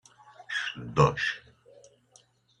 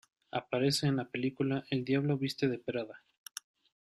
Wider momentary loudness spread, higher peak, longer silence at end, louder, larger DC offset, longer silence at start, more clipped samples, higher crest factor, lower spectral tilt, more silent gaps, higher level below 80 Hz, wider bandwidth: second, 10 LU vs 16 LU; first, -6 dBFS vs -18 dBFS; first, 1.2 s vs 0.9 s; first, -28 LUFS vs -33 LUFS; neither; about the same, 0.4 s vs 0.35 s; neither; first, 24 dB vs 16 dB; about the same, -5.5 dB/octave vs -5.5 dB/octave; neither; first, -56 dBFS vs -72 dBFS; second, 9.8 kHz vs 14 kHz